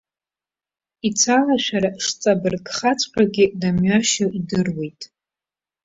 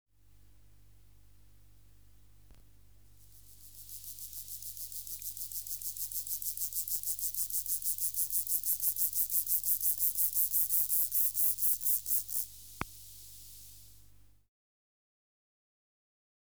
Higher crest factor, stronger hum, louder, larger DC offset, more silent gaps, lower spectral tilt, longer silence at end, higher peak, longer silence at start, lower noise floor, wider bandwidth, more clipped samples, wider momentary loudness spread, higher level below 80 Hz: about the same, 18 dB vs 22 dB; second, none vs 50 Hz at -65 dBFS; first, -19 LUFS vs -30 LUFS; second, under 0.1% vs 0.1%; neither; first, -4 dB/octave vs 0 dB/octave; second, 0.8 s vs 2.55 s; first, -2 dBFS vs -14 dBFS; second, 1.05 s vs 2.5 s; first, under -90 dBFS vs -63 dBFS; second, 8 kHz vs over 20 kHz; neither; second, 10 LU vs 19 LU; first, -52 dBFS vs -64 dBFS